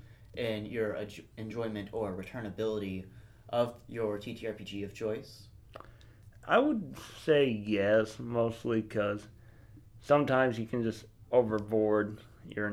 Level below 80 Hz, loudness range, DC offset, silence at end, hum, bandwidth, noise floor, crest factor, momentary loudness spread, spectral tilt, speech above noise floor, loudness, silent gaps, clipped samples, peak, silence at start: -60 dBFS; 7 LU; under 0.1%; 0 s; none; 15 kHz; -55 dBFS; 20 dB; 17 LU; -6.5 dB/octave; 23 dB; -32 LUFS; none; under 0.1%; -12 dBFS; 0.2 s